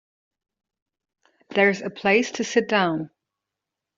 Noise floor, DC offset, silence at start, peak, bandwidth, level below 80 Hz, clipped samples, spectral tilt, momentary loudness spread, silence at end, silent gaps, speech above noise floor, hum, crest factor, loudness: -85 dBFS; under 0.1%; 1.5 s; -4 dBFS; 7.8 kHz; -70 dBFS; under 0.1%; -3 dB/octave; 8 LU; 0.9 s; none; 64 dB; none; 20 dB; -22 LUFS